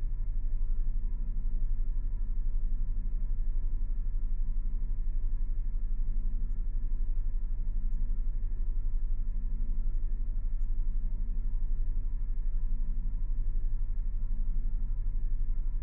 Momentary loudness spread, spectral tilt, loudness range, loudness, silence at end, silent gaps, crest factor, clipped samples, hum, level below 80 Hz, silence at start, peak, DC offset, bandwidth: 1 LU; -11.5 dB/octave; 0 LU; -38 LUFS; 0 s; none; 8 dB; under 0.1%; none; -28 dBFS; 0 s; -20 dBFS; under 0.1%; 1 kHz